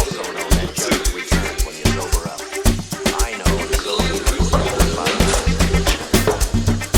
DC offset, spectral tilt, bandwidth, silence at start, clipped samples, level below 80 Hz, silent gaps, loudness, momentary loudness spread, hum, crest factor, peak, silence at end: under 0.1%; -4 dB/octave; over 20 kHz; 0 s; under 0.1%; -22 dBFS; none; -19 LUFS; 4 LU; none; 18 dB; 0 dBFS; 0 s